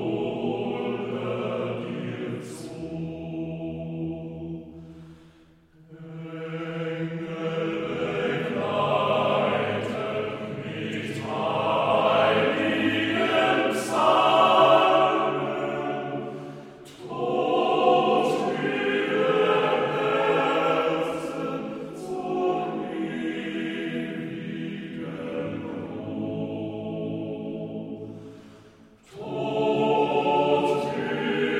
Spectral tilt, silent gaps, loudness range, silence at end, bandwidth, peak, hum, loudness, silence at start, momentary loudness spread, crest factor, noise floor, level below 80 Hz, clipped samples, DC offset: -6 dB/octave; none; 13 LU; 0 s; 14.5 kHz; -4 dBFS; none; -25 LUFS; 0 s; 15 LU; 20 dB; -56 dBFS; -62 dBFS; under 0.1%; under 0.1%